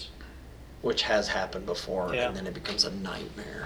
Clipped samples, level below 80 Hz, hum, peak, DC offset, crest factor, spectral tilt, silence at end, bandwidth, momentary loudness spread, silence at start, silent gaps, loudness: under 0.1%; -48 dBFS; none; -8 dBFS; under 0.1%; 24 dB; -3.5 dB/octave; 0 s; over 20 kHz; 20 LU; 0 s; none; -30 LUFS